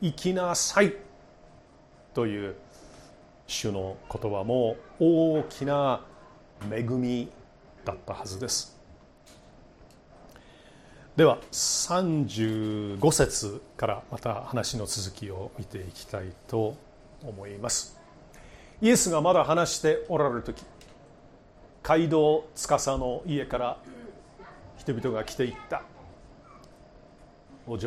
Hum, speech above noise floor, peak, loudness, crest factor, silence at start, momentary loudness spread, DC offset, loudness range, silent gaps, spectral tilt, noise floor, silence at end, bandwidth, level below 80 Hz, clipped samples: none; 28 dB; -8 dBFS; -27 LUFS; 22 dB; 0 s; 18 LU; under 0.1%; 10 LU; none; -4.5 dB/octave; -55 dBFS; 0 s; 15 kHz; -52 dBFS; under 0.1%